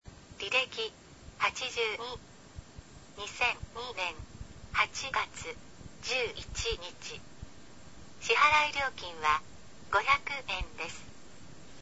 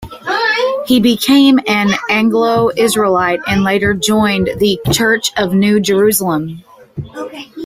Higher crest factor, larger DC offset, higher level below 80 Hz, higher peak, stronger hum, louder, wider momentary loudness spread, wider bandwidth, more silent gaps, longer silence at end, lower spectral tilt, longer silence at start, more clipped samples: first, 22 dB vs 12 dB; first, 0.3% vs under 0.1%; second, -52 dBFS vs -42 dBFS; second, -12 dBFS vs 0 dBFS; neither; second, -31 LUFS vs -12 LUFS; first, 24 LU vs 15 LU; second, 8 kHz vs 16 kHz; neither; about the same, 0 s vs 0 s; second, -1.5 dB/octave vs -4.5 dB/octave; about the same, 0 s vs 0 s; neither